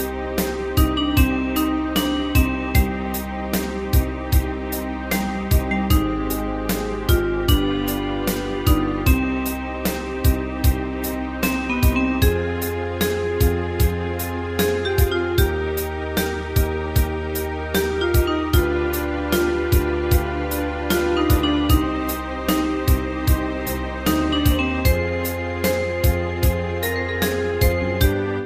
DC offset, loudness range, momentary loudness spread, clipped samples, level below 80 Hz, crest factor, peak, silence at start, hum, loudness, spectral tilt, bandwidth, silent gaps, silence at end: under 0.1%; 1 LU; 6 LU; under 0.1%; -26 dBFS; 18 dB; -4 dBFS; 0 s; none; -21 LUFS; -5.5 dB/octave; 15.5 kHz; none; 0 s